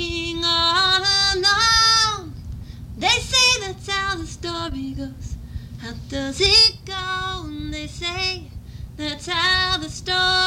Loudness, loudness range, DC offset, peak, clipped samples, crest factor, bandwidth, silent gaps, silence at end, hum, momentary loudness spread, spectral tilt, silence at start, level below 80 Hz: -18 LUFS; 6 LU; under 0.1%; -4 dBFS; under 0.1%; 18 dB; 17 kHz; none; 0 s; none; 21 LU; -2 dB/octave; 0 s; -38 dBFS